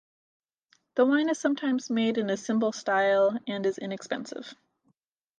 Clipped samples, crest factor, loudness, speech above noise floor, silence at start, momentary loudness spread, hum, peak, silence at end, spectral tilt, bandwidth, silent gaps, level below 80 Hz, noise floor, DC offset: under 0.1%; 18 dB; -27 LUFS; 47 dB; 0.95 s; 11 LU; none; -12 dBFS; 0.85 s; -4.5 dB/octave; 9.6 kHz; none; -78 dBFS; -74 dBFS; under 0.1%